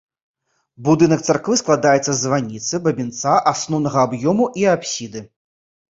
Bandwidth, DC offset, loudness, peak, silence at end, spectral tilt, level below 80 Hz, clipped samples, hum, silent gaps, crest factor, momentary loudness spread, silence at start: 7.8 kHz; under 0.1%; -18 LUFS; -2 dBFS; 0.7 s; -4.5 dB/octave; -58 dBFS; under 0.1%; none; none; 18 dB; 9 LU; 0.8 s